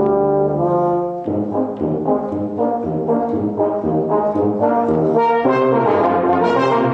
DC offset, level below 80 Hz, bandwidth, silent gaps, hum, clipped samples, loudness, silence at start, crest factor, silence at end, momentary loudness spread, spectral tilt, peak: under 0.1%; -50 dBFS; 7.8 kHz; none; none; under 0.1%; -17 LUFS; 0 s; 12 dB; 0 s; 6 LU; -9 dB/octave; -4 dBFS